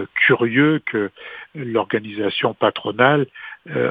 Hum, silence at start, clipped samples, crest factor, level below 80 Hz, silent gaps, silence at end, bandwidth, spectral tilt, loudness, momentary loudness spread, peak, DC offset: none; 0 s; under 0.1%; 20 dB; -64 dBFS; none; 0 s; 4.9 kHz; -8.5 dB/octave; -19 LUFS; 14 LU; 0 dBFS; under 0.1%